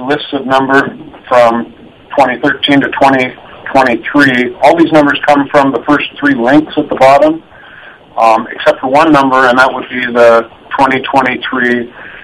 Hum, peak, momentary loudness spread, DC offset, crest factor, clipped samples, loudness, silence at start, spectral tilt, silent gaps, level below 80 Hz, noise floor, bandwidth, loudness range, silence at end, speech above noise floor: none; 0 dBFS; 9 LU; under 0.1%; 10 dB; 2%; -9 LUFS; 0 s; -5.5 dB/octave; none; -44 dBFS; -34 dBFS; 12.5 kHz; 2 LU; 0.05 s; 26 dB